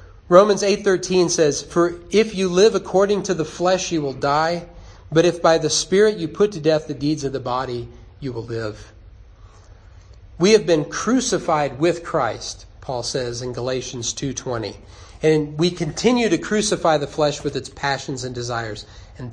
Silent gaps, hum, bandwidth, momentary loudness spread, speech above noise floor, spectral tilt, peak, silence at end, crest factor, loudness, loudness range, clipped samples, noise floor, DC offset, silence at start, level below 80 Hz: none; none; 10.5 kHz; 13 LU; 25 dB; -4.5 dB/octave; 0 dBFS; 0 s; 20 dB; -20 LUFS; 6 LU; under 0.1%; -45 dBFS; under 0.1%; 0 s; -46 dBFS